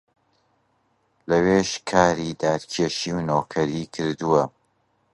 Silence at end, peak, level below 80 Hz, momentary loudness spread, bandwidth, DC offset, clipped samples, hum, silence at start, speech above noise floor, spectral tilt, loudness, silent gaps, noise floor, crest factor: 0.65 s; -2 dBFS; -52 dBFS; 8 LU; 11.5 kHz; under 0.1%; under 0.1%; none; 1.3 s; 46 dB; -5 dB/octave; -23 LUFS; none; -68 dBFS; 22 dB